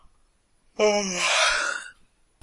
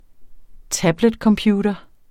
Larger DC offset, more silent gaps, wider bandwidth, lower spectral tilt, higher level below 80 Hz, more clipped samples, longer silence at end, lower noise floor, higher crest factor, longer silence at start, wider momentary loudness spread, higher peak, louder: neither; neither; second, 11.5 kHz vs 16 kHz; second, -1 dB/octave vs -5 dB/octave; second, -56 dBFS vs -44 dBFS; neither; first, 0.5 s vs 0.3 s; first, -64 dBFS vs -38 dBFS; about the same, 18 dB vs 18 dB; first, 0.8 s vs 0.2 s; first, 20 LU vs 9 LU; second, -8 dBFS vs -2 dBFS; second, -22 LUFS vs -19 LUFS